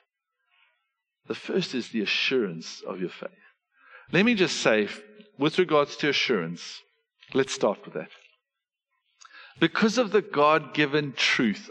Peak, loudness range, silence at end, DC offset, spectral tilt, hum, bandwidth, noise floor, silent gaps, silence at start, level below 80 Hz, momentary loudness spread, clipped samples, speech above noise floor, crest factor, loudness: -6 dBFS; 5 LU; 0 s; under 0.1%; -4.5 dB/octave; none; 9.8 kHz; -87 dBFS; none; 1.3 s; -74 dBFS; 16 LU; under 0.1%; 62 dB; 22 dB; -25 LUFS